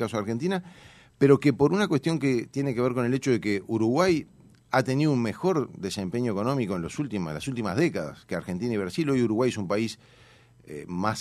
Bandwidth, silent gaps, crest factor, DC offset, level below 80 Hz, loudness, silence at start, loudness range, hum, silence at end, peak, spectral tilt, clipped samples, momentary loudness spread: 13.5 kHz; none; 20 dB; under 0.1%; -60 dBFS; -26 LUFS; 0 s; 4 LU; none; 0 s; -6 dBFS; -6.5 dB/octave; under 0.1%; 10 LU